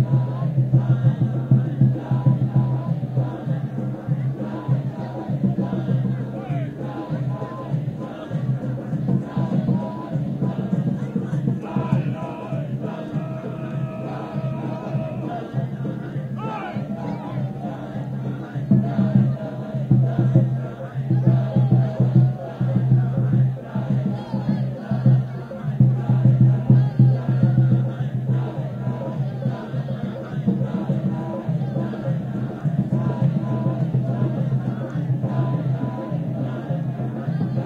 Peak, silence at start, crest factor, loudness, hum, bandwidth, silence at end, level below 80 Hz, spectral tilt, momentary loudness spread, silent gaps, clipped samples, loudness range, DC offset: -4 dBFS; 0 s; 18 dB; -23 LUFS; none; 4.3 kHz; 0 s; -52 dBFS; -10.5 dB/octave; 10 LU; none; under 0.1%; 9 LU; under 0.1%